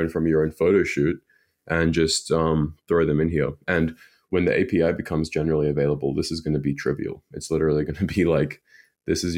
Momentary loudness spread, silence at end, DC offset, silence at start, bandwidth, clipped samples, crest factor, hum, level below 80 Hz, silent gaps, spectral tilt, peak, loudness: 7 LU; 0 s; under 0.1%; 0 s; 16 kHz; under 0.1%; 16 dB; none; -42 dBFS; none; -6 dB/octave; -6 dBFS; -23 LUFS